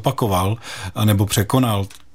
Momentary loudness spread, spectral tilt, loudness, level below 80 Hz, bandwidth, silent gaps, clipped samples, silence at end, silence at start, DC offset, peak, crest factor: 8 LU; -5.5 dB/octave; -19 LUFS; -46 dBFS; 16.5 kHz; none; under 0.1%; 0.25 s; 0 s; 0.8%; -2 dBFS; 16 dB